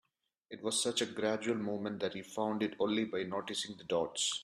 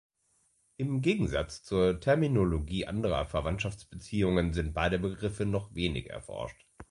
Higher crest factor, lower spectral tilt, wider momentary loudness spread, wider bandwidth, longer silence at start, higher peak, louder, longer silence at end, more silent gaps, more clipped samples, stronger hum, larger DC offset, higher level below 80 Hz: about the same, 16 dB vs 18 dB; second, -3 dB/octave vs -6.5 dB/octave; second, 6 LU vs 11 LU; first, 13.5 kHz vs 11.5 kHz; second, 0.5 s vs 0.8 s; second, -20 dBFS vs -14 dBFS; second, -36 LUFS vs -31 LUFS; about the same, 0 s vs 0.05 s; neither; neither; neither; neither; second, -76 dBFS vs -44 dBFS